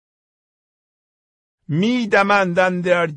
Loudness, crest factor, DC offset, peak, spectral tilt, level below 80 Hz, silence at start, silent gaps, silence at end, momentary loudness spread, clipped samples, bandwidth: -17 LUFS; 18 dB; under 0.1%; -2 dBFS; -6 dB/octave; -62 dBFS; 1.7 s; none; 0 s; 6 LU; under 0.1%; 9.4 kHz